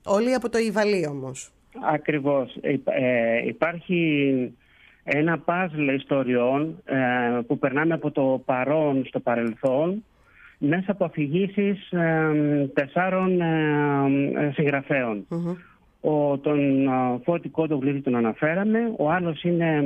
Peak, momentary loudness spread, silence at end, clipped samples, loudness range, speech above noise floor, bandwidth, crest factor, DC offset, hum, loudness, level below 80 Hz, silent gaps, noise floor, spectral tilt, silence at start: -6 dBFS; 5 LU; 0 s; under 0.1%; 2 LU; 30 dB; 11.5 kHz; 16 dB; under 0.1%; none; -24 LUFS; -62 dBFS; none; -53 dBFS; -7 dB/octave; 0.05 s